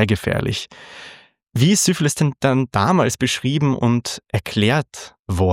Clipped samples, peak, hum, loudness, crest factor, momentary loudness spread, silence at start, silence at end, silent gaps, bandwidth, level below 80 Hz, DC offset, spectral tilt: under 0.1%; 0 dBFS; none; -19 LUFS; 18 dB; 17 LU; 0 s; 0 s; 5.19-5.25 s; 16 kHz; -48 dBFS; under 0.1%; -5 dB/octave